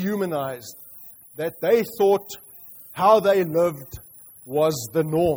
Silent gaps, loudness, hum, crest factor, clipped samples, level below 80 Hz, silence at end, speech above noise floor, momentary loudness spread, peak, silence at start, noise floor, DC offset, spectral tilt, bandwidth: none; -22 LUFS; none; 18 dB; under 0.1%; -56 dBFS; 0 s; 23 dB; 23 LU; -4 dBFS; 0 s; -45 dBFS; under 0.1%; -5.5 dB/octave; over 20 kHz